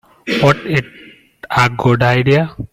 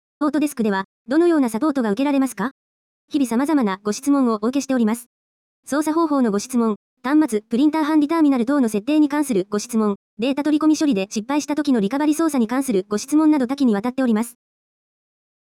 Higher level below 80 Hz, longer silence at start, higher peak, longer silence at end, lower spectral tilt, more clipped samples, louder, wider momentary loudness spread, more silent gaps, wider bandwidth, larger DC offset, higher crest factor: first, -44 dBFS vs -66 dBFS; about the same, 0.25 s vs 0.2 s; first, 0 dBFS vs -8 dBFS; second, 0.05 s vs 1.3 s; about the same, -6.5 dB/octave vs -5.5 dB/octave; neither; first, -14 LUFS vs -20 LUFS; about the same, 7 LU vs 6 LU; second, none vs 0.85-1.05 s, 2.51-3.08 s, 5.06-5.63 s, 6.76-6.97 s, 9.96-10.17 s; about the same, 15 kHz vs 15.5 kHz; neither; about the same, 14 dB vs 12 dB